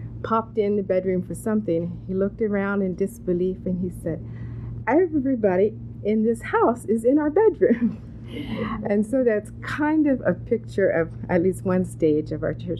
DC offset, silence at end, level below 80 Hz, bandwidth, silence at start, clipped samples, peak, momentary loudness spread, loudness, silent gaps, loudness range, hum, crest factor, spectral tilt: under 0.1%; 0 s; -46 dBFS; 13.5 kHz; 0 s; under 0.1%; -6 dBFS; 9 LU; -23 LUFS; none; 4 LU; none; 16 dB; -8 dB/octave